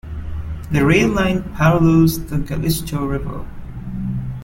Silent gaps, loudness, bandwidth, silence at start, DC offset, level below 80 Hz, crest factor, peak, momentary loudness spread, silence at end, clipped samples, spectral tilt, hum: none; -18 LUFS; 16.5 kHz; 0.05 s; under 0.1%; -32 dBFS; 16 dB; -2 dBFS; 16 LU; 0 s; under 0.1%; -6.5 dB/octave; none